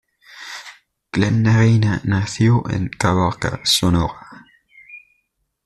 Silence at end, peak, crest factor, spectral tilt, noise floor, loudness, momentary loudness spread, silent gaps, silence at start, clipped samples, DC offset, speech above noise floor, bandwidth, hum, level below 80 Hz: 0.65 s; -2 dBFS; 16 dB; -5.5 dB/octave; -70 dBFS; -18 LUFS; 18 LU; none; 0.35 s; under 0.1%; under 0.1%; 53 dB; 13.5 kHz; none; -42 dBFS